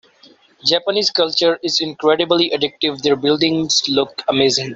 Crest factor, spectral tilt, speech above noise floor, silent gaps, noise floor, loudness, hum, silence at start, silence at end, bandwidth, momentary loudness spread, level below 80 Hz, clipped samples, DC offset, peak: 16 dB; -3 dB/octave; 33 dB; none; -50 dBFS; -16 LUFS; none; 0.65 s; 0 s; 8 kHz; 4 LU; -58 dBFS; under 0.1%; under 0.1%; -2 dBFS